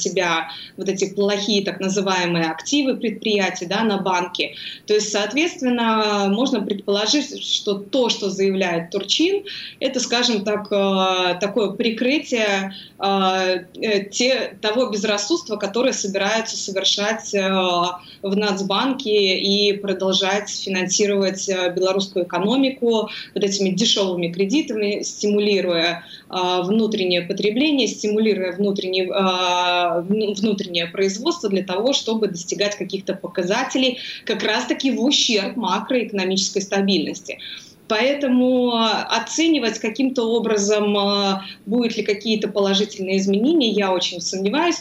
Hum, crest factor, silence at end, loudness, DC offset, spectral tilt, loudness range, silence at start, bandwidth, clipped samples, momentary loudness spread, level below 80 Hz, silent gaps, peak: none; 16 dB; 0 s; -20 LUFS; under 0.1%; -3.5 dB/octave; 2 LU; 0 s; 15.5 kHz; under 0.1%; 6 LU; -68 dBFS; none; -4 dBFS